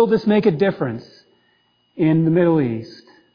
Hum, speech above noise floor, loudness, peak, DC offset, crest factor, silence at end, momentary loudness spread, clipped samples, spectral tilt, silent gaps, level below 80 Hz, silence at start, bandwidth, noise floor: none; 45 dB; -18 LUFS; -4 dBFS; under 0.1%; 14 dB; 0.4 s; 14 LU; under 0.1%; -9.5 dB/octave; none; -58 dBFS; 0 s; 5.2 kHz; -62 dBFS